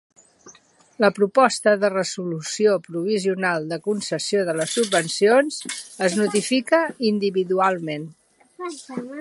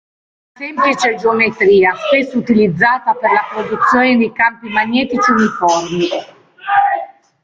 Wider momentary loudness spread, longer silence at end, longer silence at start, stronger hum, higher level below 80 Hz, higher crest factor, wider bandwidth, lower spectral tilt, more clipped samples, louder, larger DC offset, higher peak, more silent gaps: first, 14 LU vs 9 LU; second, 0 s vs 0.35 s; second, 0.45 s vs 0.6 s; neither; second, -74 dBFS vs -54 dBFS; first, 20 dB vs 14 dB; first, 11.5 kHz vs 7.8 kHz; about the same, -4 dB/octave vs -5 dB/octave; neither; second, -21 LUFS vs -13 LUFS; neither; about the same, -2 dBFS vs 0 dBFS; neither